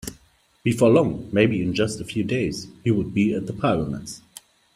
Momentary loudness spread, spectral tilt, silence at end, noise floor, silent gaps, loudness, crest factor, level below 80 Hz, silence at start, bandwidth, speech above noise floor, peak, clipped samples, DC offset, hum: 13 LU; -6.5 dB/octave; 0.55 s; -57 dBFS; none; -22 LUFS; 20 dB; -50 dBFS; 0.05 s; 16 kHz; 36 dB; -4 dBFS; under 0.1%; under 0.1%; none